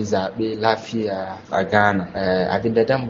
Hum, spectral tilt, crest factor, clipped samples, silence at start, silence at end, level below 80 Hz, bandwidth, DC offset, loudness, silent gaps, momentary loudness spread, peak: none; -4.5 dB/octave; 20 dB; under 0.1%; 0 s; 0 s; -52 dBFS; 7.6 kHz; under 0.1%; -21 LUFS; none; 8 LU; 0 dBFS